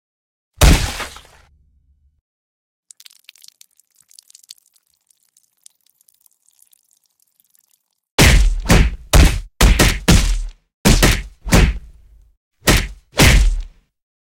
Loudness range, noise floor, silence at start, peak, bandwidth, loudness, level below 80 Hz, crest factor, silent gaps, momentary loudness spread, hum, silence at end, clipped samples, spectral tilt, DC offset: 7 LU; -64 dBFS; 0.6 s; 0 dBFS; 17 kHz; -15 LUFS; -20 dBFS; 18 dB; 2.21-2.83 s, 8.11-8.18 s, 10.74-10.84 s, 12.37-12.51 s; 12 LU; none; 0.65 s; under 0.1%; -4 dB/octave; under 0.1%